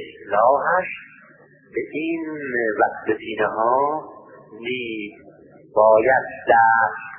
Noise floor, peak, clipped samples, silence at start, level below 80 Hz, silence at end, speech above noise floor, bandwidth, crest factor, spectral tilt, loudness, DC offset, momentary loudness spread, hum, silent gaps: -50 dBFS; -2 dBFS; under 0.1%; 0 s; -62 dBFS; 0 s; 31 dB; 3.4 kHz; 18 dB; -9.5 dB/octave; -20 LUFS; under 0.1%; 16 LU; none; none